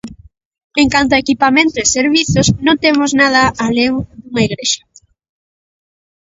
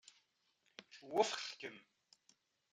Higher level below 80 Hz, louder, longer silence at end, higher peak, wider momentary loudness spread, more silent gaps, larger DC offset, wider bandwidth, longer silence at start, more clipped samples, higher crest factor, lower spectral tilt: first, -38 dBFS vs under -90 dBFS; first, -13 LUFS vs -41 LUFS; first, 1.45 s vs 0.9 s; first, 0 dBFS vs -20 dBFS; second, 7 LU vs 23 LU; first, 0.45-0.51 s, 0.64-0.70 s vs none; neither; second, 8 kHz vs 11.5 kHz; second, 0.05 s vs 0.8 s; neither; second, 14 dB vs 26 dB; first, -3.5 dB/octave vs -2 dB/octave